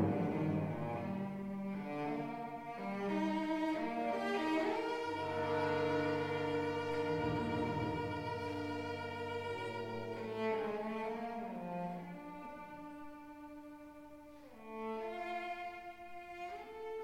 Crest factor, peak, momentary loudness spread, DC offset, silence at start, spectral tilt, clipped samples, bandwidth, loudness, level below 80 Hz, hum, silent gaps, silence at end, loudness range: 18 dB; -22 dBFS; 15 LU; under 0.1%; 0 s; -7 dB/octave; under 0.1%; 16 kHz; -39 LUFS; -68 dBFS; none; none; 0 s; 10 LU